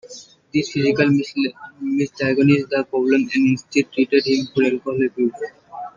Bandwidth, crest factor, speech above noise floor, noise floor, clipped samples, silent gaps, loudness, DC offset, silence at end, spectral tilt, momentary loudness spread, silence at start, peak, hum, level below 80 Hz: 7.4 kHz; 16 dB; 23 dB; -42 dBFS; under 0.1%; none; -19 LUFS; under 0.1%; 0.1 s; -6 dB/octave; 11 LU; 0.05 s; -2 dBFS; none; -60 dBFS